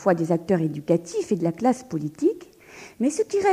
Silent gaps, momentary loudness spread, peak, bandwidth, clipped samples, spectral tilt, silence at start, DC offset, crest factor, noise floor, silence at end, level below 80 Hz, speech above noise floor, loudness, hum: none; 9 LU; -6 dBFS; 15 kHz; under 0.1%; -6.5 dB/octave; 0 s; under 0.1%; 18 dB; -46 dBFS; 0 s; -64 dBFS; 23 dB; -24 LUFS; none